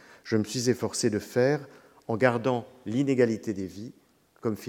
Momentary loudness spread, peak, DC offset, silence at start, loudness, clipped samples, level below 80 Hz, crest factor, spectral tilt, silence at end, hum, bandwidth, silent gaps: 11 LU; -6 dBFS; under 0.1%; 0.25 s; -28 LUFS; under 0.1%; -68 dBFS; 22 dB; -5.5 dB/octave; 0 s; none; 17 kHz; none